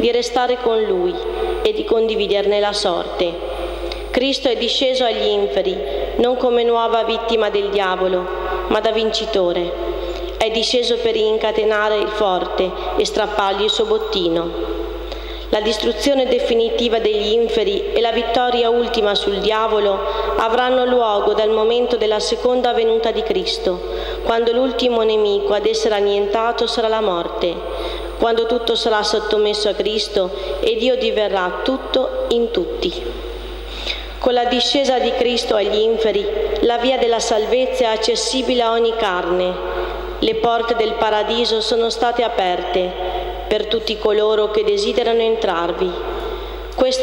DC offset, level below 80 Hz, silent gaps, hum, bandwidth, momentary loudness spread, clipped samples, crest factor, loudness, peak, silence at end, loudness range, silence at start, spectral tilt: under 0.1%; -36 dBFS; none; none; 16.5 kHz; 7 LU; under 0.1%; 12 dB; -18 LUFS; -6 dBFS; 0 s; 2 LU; 0 s; -3.5 dB/octave